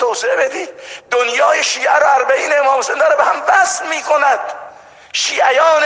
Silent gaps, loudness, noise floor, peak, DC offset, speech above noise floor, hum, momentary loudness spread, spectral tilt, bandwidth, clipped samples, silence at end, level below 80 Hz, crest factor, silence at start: none; -13 LUFS; -38 dBFS; 0 dBFS; under 0.1%; 25 dB; none; 10 LU; 0.5 dB/octave; 10 kHz; under 0.1%; 0 s; -66 dBFS; 14 dB; 0 s